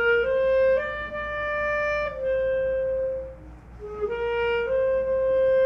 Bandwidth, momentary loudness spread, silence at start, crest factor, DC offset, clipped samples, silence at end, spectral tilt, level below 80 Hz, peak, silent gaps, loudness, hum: 6.2 kHz; 11 LU; 0 s; 12 dB; under 0.1%; under 0.1%; 0 s; -5.5 dB/octave; -46 dBFS; -12 dBFS; none; -25 LUFS; none